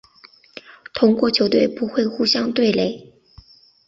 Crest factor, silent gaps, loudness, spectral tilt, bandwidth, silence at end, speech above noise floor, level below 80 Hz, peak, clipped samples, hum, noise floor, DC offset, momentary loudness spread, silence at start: 18 dB; none; -18 LUFS; -5.5 dB/octave; 7.8 kHz; 0.85 s; 32 dB; -56 dBFS; -4 dBFS; under 0.1%; none; -50 dBFS; under 0.1%; 21 LU; 0.95 s